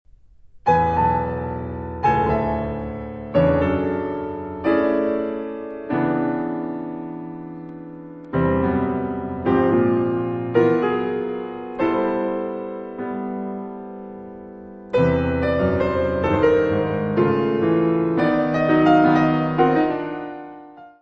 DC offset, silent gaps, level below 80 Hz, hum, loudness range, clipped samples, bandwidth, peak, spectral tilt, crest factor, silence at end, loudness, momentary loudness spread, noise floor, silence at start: under 0.1%; none; -42 dBFS; none; 8 LU; under 0.1%; 6.4 kHz; -4 dBFS; -9 dB/octave; 18 dB; 0.1 s; -21 LUFS; 16 LU; -48 dBFS; 0.45 s